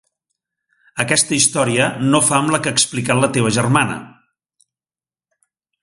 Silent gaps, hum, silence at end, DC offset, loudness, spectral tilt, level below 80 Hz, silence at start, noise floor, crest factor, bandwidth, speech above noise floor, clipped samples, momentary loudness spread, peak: none; none; 1.75 s; under 0.1%; -15 LUFS; -3.5 dB/octave; -54 dBFS; 0.95 s; under -90 dBFS; 18 dB; 11.5 kHz; over 74 dB; under 0.1%; 7 LU; 0 dBFS